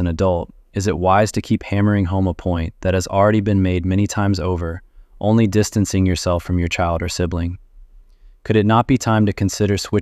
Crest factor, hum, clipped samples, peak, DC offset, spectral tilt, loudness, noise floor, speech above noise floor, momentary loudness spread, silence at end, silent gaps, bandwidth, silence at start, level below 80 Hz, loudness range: 16 dB; none; under 0.1%; -2 dBFS; under 0.1%; -6.5 dB/octave; -18 LUFS; -45 dBFS; 28 dB; 9 LU; 0 s; none; 14.5 kHz; 0 s; -36 dBFS; 2 LU